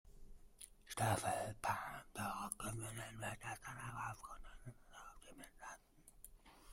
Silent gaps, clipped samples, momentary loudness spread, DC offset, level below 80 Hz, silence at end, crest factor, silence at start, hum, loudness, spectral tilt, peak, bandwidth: none; under 0.1%; 20 LU; under 0.1%; -64 dBFS; 0 s; 22 dB; 0.05 s; none; -45 LUFS; -4 dB/octave; -26 dBFS; 16 kHz